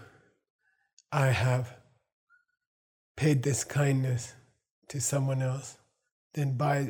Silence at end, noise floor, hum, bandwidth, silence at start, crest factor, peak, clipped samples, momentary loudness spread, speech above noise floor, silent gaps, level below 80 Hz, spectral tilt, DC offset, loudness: 0 s; -57 dBFS; none; 17.5 kHz; 0 s; 20 dB; -12 dBFS; under 0.1%; 15 LU; 29 dB; 0.50-0.59 s, 0.93-0.97 s, 2.12-2.27 s, 2.67-3.15 s, 4.71-4.82 s, 6.12-6.30 s; -66 dBFS; -5.5 dB/octave; under 0.1%; -29 LUFS